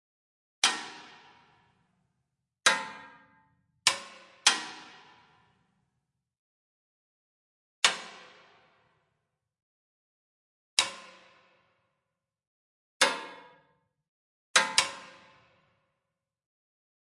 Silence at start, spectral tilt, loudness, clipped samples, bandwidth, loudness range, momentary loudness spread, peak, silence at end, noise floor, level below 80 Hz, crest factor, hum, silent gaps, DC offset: 0.65 s; 1.5 dB/octave; -27 LUFS; under 0.1%; 12 kHz; 7 LU; 22 LU; -4 dBFS; 2.05 s; -86 dBFS; -82 dBFS; 32 dB; none; 6.39-7.82 s, 9.63-10.77 s, 12.47-13.00 s, 14.08-14.54 s; under 0.1%